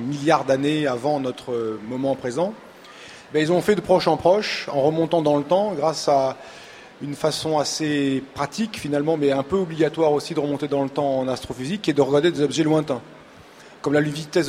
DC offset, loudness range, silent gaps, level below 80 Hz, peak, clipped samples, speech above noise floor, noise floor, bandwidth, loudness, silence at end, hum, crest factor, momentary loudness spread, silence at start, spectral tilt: under 0.1%; 3 LU; none; -58 dBFS; -4 dBFS; under 0.1%; 24 dB; -46 dBFS; 16 kHz; -22 LUFS; 0 s; none; 18 dB; 9 LU; 0 s; -5.5 dB/octave